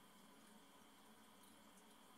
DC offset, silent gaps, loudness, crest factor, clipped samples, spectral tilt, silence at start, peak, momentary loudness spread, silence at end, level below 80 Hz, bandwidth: under 0.1%; none; -66 LUFS; 14 dB; under 0.1%; -3 dB/octave; 0 s; -52 dBFS; 1 LU; 0 s; under -90 dBFS; 16 kHz